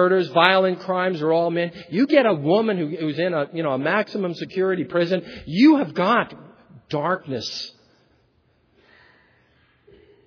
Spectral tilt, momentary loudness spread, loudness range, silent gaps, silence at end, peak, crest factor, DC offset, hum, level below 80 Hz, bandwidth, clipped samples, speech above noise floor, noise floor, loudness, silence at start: -6.5 dB/octave; 11 LU; 11 LU; none; 2.55 s; 0 dBFS; 22 dB; under 0.1%; none; -62 dBFS; 5.4 kHz; under 0.1%; 42 dB; -63 dBFS; -21 LUFS; 0 s